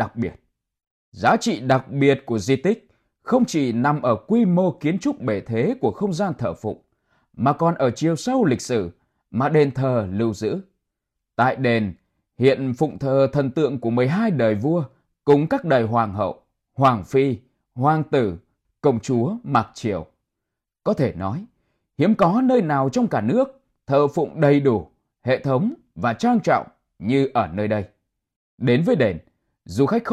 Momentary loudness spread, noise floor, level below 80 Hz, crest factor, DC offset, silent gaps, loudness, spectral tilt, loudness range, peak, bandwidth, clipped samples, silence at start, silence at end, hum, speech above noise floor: 10 LU; -83 dBFS; -56 dBFS; 18 dB; under 0.1%; 0.87-1.12 s, 28.36-28.58 s; -21 LUFS; -7 dB/octave; 3 LU; -4 dBFS; 12.5 kHz; under 0.1%; 0 s; 0 s; none; 63 dB